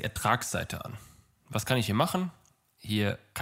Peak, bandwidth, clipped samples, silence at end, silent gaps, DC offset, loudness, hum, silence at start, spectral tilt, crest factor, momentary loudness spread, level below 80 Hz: -8 dBFS; 16 kHz; under 0.1%; 0 s; none; under 0.1%; -30 LUFS; none; 0 s; -4.5 dB/octave; 22 dB; 13 LU; -56 dBFS